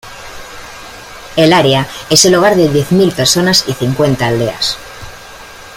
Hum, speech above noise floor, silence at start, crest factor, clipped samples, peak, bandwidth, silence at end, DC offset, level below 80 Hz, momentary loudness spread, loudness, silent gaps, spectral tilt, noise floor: 60 Hz at -30 dBFS; 22 dB; 0.05 s; 12 dB; under 0.1%; 0 dBFS; 16.5 kHz; 0 s; under 0.1%; -40 dBFS; 22 LU; -10 LUFS; none; -4 dB/octave; -32 dBFS